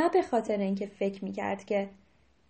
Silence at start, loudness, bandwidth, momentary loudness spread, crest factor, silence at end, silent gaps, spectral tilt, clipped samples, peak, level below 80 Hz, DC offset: 0 s; -31 LUFS; 8.4 kHz; 7 LU; 16 dB; 0.55 s; none; -7 dB/octave; under 0.1%; -14 dBFS; -68 dBFS; under 0.1%